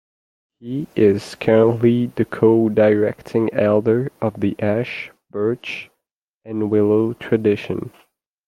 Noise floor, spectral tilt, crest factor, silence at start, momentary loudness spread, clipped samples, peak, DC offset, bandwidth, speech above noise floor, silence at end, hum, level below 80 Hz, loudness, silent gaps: -78 dBFS; -8 dB/octave; 18 dB; 0.6 s; 13 LU; under 0.1%; -2 dBFS; under 0.1%; 12 kHz; 60 dB; 0.6 s; none; -58 dBFS; -19 LUFS; 6.12-6.41 s